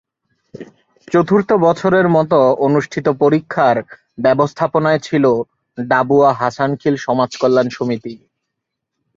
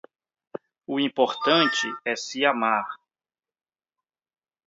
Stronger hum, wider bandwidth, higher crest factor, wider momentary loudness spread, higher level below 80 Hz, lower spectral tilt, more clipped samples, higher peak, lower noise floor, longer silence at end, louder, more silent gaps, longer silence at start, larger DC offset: neither; about the same, 7.6 kHz vs 7.8 kHz; second, 14 dB vs 22 dB; second, 8 LU vs 22 LU; first, -56 dBFS vs -82 dBFS; first, -7 dB/octave vs -3 dB/octave; neither; first, -2 dBFS vs -6 dBFS; second, -77 dBFS vs under -90 dBFS; second, 1 s vs 1.7 s; first, -15 LUFS vs -23 LUFS; neither; second, 0.55 s vs 0.9 s; neither